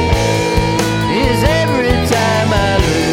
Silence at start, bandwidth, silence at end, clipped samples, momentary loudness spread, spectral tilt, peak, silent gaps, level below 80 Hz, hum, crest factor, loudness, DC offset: 0 s; 17 kHz; 0 s; under 0.1%; 2 LU; -5 dB/octave; 0 dBFS; none; -24 dBFS; none; 12 dB; -13 LUFS; under 0.1%